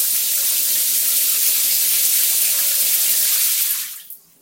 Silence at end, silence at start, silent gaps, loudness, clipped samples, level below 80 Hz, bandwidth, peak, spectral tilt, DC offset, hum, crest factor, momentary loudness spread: 0.25 s; 0 s; none; -14 LUFS; under 0.1%; -84 dBFS; 17 kHz; 0 dBFS; 4 dB/octave; under 0.1%; none; 18 dB; 4 LU